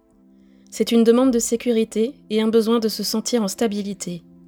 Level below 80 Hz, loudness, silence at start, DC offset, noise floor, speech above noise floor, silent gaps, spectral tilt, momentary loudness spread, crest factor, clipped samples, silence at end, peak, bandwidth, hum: -58 dBFS; -20 LUFS; 0.7 s; under 0.1%; -53 dBFS; 33 dB; none; -4.5 dB/octave; 12 LU; 18 dB; under 0.1%; 0.3 s; -4 dBFS; 18 kHz; none